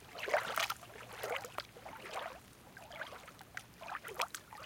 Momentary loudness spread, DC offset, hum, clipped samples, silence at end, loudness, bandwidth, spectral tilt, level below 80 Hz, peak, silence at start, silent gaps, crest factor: 15 LU; under 0.1%; none; under 0.1%; 0 s; -42 LUFS; 17 kHz; -1.5 dB/octave; -70 dBFS; -18 dBFS; 0 s; none; 26 dB